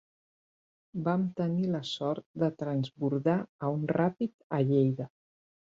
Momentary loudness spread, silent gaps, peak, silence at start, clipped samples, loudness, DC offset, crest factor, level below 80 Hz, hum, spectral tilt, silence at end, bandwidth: 7 LU; 2.26-2.34 s, 3.49-3.59 s, 4.34-4.50 s; -14 dBFS; 0.95 s; under 0.1%; -31 LUFS; under 0.1%; 18 dB; -70 dBFS; none; -8 dB/octave; 0.6 s; 7.6 kHz